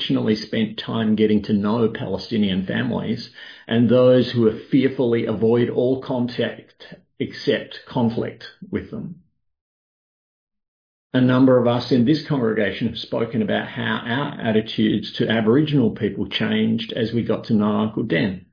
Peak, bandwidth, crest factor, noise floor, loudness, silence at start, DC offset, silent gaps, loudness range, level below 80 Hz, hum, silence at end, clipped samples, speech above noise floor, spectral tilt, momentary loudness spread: -4 dBFS; 5.2 kHz; 16 dB; under -90 dBFS; -21 LUFS; 0 s; under 0.1%; 9.61-10.47 s, 10.68-11.10 s; 8 LU; -56 dBFS; none; 0.1 s; under 0.1%; over 70 dB; -8 dB/octave; 11 LU